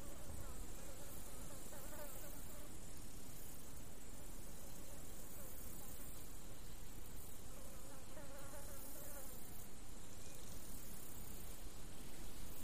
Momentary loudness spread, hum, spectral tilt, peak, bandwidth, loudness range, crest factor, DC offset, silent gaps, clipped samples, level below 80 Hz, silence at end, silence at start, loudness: 4 LU; none; -3.5 dB/octave; -34 dBFS; 15.5 kHz; 1 LU; 16 dB; 0.7%; none; under 0.1%; -58 dBFS; 0 s; 0 s; -54 LUFS